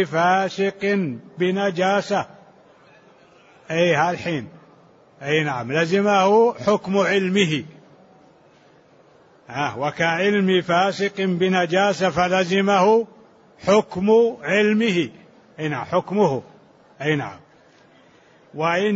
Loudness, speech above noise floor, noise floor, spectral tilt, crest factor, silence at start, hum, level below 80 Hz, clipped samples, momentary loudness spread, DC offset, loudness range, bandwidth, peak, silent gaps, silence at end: -20 LUFS; 33 dB; -53 dBFS; -5.5 dB/octave; 16 dB; 0 s; none; -62 dBFS; under 0.1%; 11 LU; under 0.1%; 6 LU; 8 kHz; -6 dBFS; none; 0 s